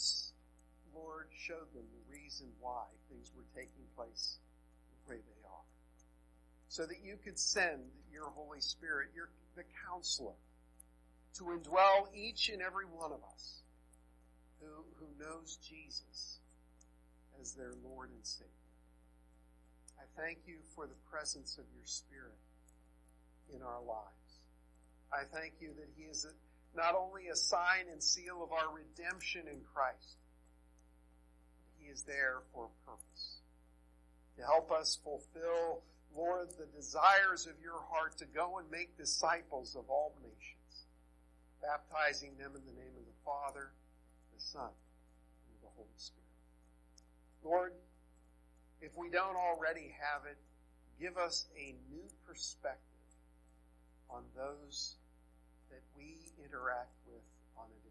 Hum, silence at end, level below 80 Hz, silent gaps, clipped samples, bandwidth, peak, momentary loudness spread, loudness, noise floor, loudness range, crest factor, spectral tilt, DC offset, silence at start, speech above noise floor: none; 0 s; -66 dBFS; none; under 0.1%; 12 kHz; -16 dBFS; 22 LU; -39 LUFS; -66 dBFS; 15 LU; 28 dB; -1 dB/octave; under 0.1%; 0 s; 25 dB